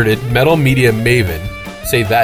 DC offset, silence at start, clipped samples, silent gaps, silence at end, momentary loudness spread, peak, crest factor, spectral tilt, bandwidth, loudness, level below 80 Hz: under 0.1%; 0 s; under 0.1%; none; 0 s; 13 LU; 0 dBFS; 12 dB; -5.5 dB/octave; over 20 kHz; -13 LUFS; -32 dBFS